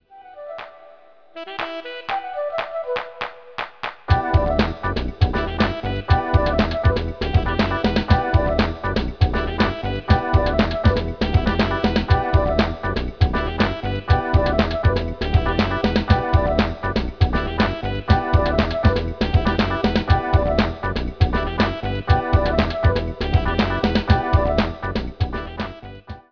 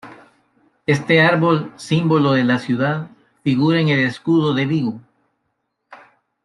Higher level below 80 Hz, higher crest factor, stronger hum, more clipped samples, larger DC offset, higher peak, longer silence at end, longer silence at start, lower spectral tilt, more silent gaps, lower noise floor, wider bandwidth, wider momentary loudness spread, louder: first, -26 dBFS vs -60 dBFS; about the same, 18 dB vs 18 dB; neither; neither; first, 0.4% vs under 0.1%; about the same, -2 dBFS vs -2 dBFS; second, 0.1 s vs 0.5 s; about the same, 0.1 s vs 0.05 s; about the same, -8 dB/octave vs -7 dB/octave; neither; second, -49 dBFS vs -72 dBFS; second, 5.4 kHz vs 11.5 kHz; about the same, 10 LU vs 12 LU; second, -21 LUFS vs -17 LUFS